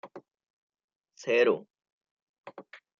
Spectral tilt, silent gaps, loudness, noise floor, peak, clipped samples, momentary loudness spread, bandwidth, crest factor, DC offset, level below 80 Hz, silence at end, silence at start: -4.5 dB/octave; 0.50-0.68 s, 0.84-0.88 s, 0.96-1.00 s, 1.92-2.01 s, 2.11-2.44 s; -27 LUFS; -50 dBFS; -12 dBFS; under 0.1%; 25 LU; 7.4 kHz; 22 dB; under 0.1%; -88 dBFS; 0.25 s; 0.05 s